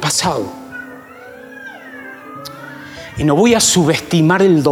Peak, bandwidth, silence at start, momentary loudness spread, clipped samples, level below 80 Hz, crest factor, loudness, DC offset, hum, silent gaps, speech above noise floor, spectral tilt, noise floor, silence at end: -2 dBFS; 17.5 kHz; 0 s; 23 LU; under 0.1%; -46 dBFS; 14 dB; -13 LUFS; under 0.1%; none; none; 23 dB; -4 dB/octave; -36 dBFS; 0 s